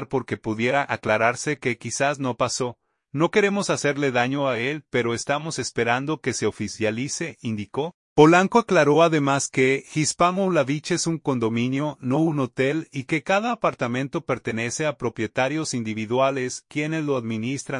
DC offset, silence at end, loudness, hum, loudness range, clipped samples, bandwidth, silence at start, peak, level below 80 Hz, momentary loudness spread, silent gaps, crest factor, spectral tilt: under 0.1%; 0 s; -23 LUFS; none; 6 LU; under 0.1%; 11 kHz; 0 s; -2 dBFS; -60 dBFS; 10 LU; 7.94-8.16 s; 20 dB; -5 dB/octave